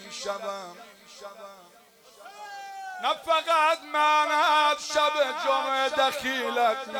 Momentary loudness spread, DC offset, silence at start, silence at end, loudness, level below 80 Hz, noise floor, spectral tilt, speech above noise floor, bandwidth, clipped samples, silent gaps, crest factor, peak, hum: 22 LU; under 0.1%; 0 s; 0 s; -24 LUFS; -72 dBFS; -52 dBFS; -0.5 dB/octave; 27 dB; over 20 kHz; under 0.1%; none; 16 dB; -12 dBFS; none